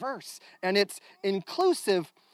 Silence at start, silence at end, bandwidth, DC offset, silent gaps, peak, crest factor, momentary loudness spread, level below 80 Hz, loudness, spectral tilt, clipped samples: 0 s; 0.25 s; 15.5 kHz; under 0.1%; none; -12 dBFS; 18 dB; 10 LU; under -90 dBFS; -29 LUFS; -4 dB/octave; under 0.1%